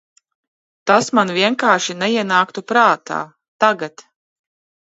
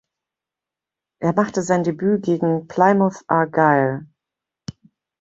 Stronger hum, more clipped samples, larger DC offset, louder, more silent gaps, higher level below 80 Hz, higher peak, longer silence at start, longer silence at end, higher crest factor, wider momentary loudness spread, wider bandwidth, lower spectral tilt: neither; neither; neither; first, -16 LUFS vs -19 LUFS; first, 3.48-3.59 s vs none; second, -70 dBFS vs -60 dBFS; about the same, 0 dBFS vs -2 dBFS; second, 0.85 s vs 1.2 s; first, 0.95 s vs 0.5 s; about the same, 18 dB vs 20 dB; second, 12 LU vs 20 LU; about the same, 8.2 kHz vs 8 kHz; second, -3.5 dB/octave vs -7 dB/octave